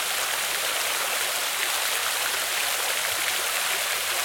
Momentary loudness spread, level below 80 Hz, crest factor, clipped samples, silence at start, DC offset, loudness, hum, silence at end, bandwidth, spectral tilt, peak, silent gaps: 1 LU; -66 dBFS; 18 dB; under 0.1%; 0 s; under 0.1%; -24 LUFS; none; 0 s; 19 kHz; 2 dB/octave; -8 dBFS; none